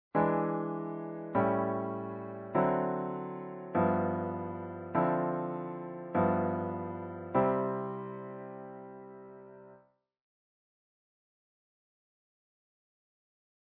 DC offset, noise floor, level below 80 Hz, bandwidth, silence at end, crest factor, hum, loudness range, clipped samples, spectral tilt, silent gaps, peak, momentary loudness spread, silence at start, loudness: under 0.1%; -65 dBFS; -72 dBFS; 4.3 kHz; 4 s; 20 dB; none; 14 LU; under 0.1%; -8.5 dB/octave; none; -14 dBFS; 16 LU; 0.15 s; -33 LUFS